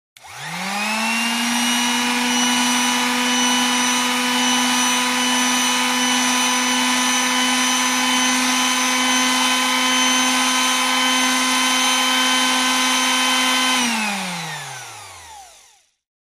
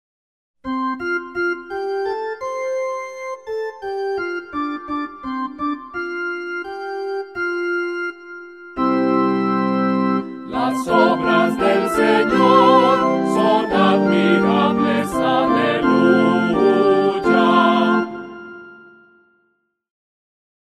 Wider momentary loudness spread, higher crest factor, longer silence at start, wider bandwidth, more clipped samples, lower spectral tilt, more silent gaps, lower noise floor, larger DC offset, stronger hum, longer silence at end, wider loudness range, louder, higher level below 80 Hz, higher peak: second, 7 LU vs 13 LU; about the same, 14 dB vs 18 dB; second, 0.25 s vs 0.65 s; first, 15.5 kHz vs 14 kHz; neither; second, 0 dB/octave vs -6.5 dB/octave; neither; second, -53 dBFS vs -68 dBFS; second, under 0.1% vs 0.1%; neither; second, 0.75 s vs 1.95 s; second, 2 LU vs 10 LU; about the same, -16 LUFS vs -18 LUFS; second, -64 dBFS vs -54 dBFS; second, -4 dBFS vs 0 dBFS